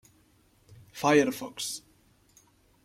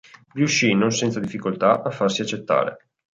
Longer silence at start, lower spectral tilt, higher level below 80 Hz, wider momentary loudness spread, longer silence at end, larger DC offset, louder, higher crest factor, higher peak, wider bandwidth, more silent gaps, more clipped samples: first, 0.95 s vs 0.35 s; about the same, -4 dB/octave vs -4.5 dB/octave; second, -68 dBFS vs -62 dBFS; first, 17 LU vs 9 LU; first, 1.05 s vs 0.45 s; neither; second, -28 LUFS vs -21 LUFS; about the same, 22 dB vs 18 dB; second, -10 dBFS vs -4 dBFS; first, 16.5 kHz vs 9.2 kHz; neither; neither